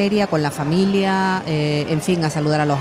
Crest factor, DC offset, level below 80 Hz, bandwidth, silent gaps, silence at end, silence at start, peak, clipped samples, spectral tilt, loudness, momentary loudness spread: 12 dB; under 0.1%; -50 dBFS; 15 kHz; none; 0 s; 0 s; -6 dBFS; under 0.1%; -6 dB/octave; -19 LUFS; 3 LU